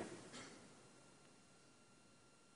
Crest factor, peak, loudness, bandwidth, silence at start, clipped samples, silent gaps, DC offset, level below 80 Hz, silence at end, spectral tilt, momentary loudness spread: 24 dB; -36 dBFS; -61 LUFS; 10.5 kHz; 0 s; under 0.1%; none; under 0.1%; -86 dBFS; 0 s; -3.5 dB/octave; 13 LU